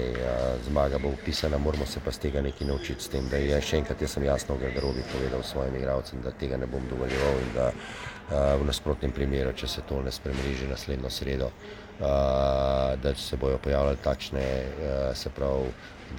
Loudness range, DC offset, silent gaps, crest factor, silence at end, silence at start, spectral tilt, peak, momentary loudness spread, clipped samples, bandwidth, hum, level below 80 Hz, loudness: 3 LU; under 0.1%; none; 18 dB; 0 s; 0 s; -5.5 dB/octave; -10 dBFS; 7 LU; under 0.1%; 17 kHz; none; -36 dBFS; -29 LUFS